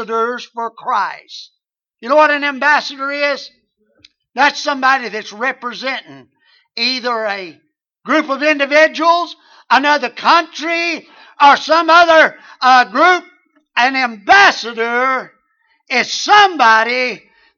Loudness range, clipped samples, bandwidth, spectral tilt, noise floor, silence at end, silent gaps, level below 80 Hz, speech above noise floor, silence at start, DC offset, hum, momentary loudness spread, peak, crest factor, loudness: 7 LU; under 0.1%; 7.4 kHz; -1.5 dB/octave; -61 dBFS; 0.4 s; none; -64 dBFS; 47 dB; 0 s; under 0.1%; none; 15 LU; 0 dBFS; 14 dB; -13 LUFS